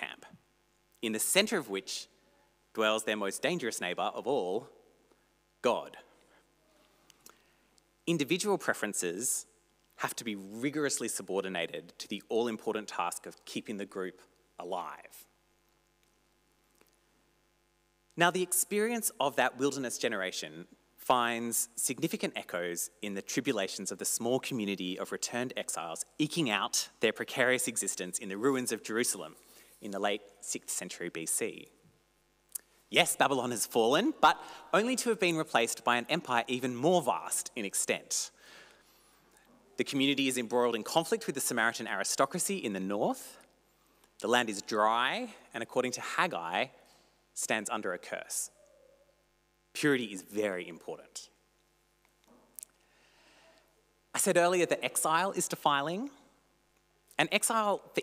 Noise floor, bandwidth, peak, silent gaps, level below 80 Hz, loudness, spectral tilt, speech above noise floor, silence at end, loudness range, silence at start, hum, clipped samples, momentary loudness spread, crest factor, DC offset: -72 dBFS; 16 kHz; -12 dBFS; none; -78 dBFS; -32 LUFS; -2.5 dB/octave; 40 dB; 0 s; 8 LU; 0 s; 50 Hz at -75 dBFS; under 0.1%; 14 LU; 22 dB; under 0.1%